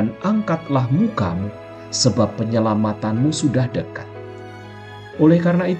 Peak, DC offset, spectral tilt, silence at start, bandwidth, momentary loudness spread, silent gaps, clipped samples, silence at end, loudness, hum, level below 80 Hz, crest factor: -4 dBFS; under 0.1%; -6 dB/octave; 0 s; 9 kHz; 20 LU; none; under 0.1%; 0 s; -19 LUFS; none; -52 dBFS; 16 dB